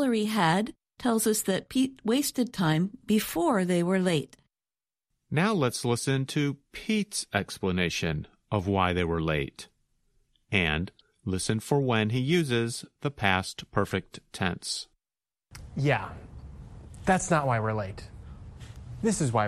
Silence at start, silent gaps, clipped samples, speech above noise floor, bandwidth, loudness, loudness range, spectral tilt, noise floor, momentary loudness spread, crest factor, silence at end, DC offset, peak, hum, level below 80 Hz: 0 s; none; under 0.1%; over 63 dB; 14 kHz; -28 LUFS; 4 LU; -5 dB/octave; under -90 dBFS; 18 LU; 22 dB; 0 s; under 0.1%; -6 dBFS; none; -52 dBFS